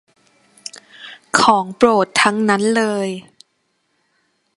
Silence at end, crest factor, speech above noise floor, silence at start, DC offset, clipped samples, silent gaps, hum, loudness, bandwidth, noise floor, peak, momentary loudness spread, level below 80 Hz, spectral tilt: 1.35 s; 18 dB; 52 dB; 1 s; under 0.1%; under 0.1%; none; none; -15 LUFS; 11.5 kHz; -67 dBFS; 0 dBFS; 22 LU; -62 dBFS; -3.5 dB/octave